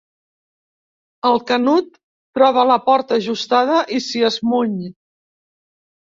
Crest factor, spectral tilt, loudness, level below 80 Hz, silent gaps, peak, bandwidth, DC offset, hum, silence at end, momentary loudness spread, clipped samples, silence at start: 18 dB; -4.5 dB/octave; -17 LUFS; -64 dBFS; 2.03-2.33 s; -2 dBFS; 7.6 kHz; under 0.1%; none; 1.15 s; 10 LU; under 0.1%; 1.25 s